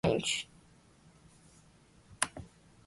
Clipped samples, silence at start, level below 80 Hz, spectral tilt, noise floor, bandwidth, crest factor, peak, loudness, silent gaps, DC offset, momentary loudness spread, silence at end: under 0.1%; 0.05 s; -60 dBFS; -3 dB/octave; -62 dBFS; 11.5 kHz; 30 dB; -8 dBFS; -34 LUFS; none; under 0.1%; 20 LU; 0.4 s